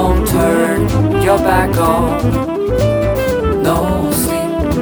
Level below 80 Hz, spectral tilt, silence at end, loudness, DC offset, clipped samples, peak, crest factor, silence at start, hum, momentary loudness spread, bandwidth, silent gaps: -24 dBFS; -6 dB/octave; 0 s; -14 LUFS; under 0.1%; under 0.1%; 0 dBFS; 12 dB; 0 s; none; 4 LU; over 20 kHz; none